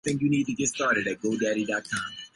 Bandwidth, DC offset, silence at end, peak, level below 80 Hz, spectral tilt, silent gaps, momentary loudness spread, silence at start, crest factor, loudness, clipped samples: 11.5 kHz; under 0.1%; 0.1 s; -12 dBFS; -62 dBFS; -4 dB/octave; none; 5 LU; 0.05 s; 16 dB; -27 LUFS; under 0.1%